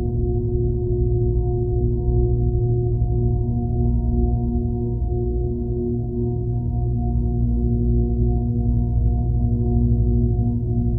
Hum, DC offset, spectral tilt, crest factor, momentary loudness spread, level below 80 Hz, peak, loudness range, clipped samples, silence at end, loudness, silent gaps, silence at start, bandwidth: none; under 0.1%; -15.5 dB/octave; 12 dB; 4 LU; -24 dBFS; -8 dBFS; 2 LU; under 0.1%; 0 s; -22 LUFS; none; 0 s; 1 kHz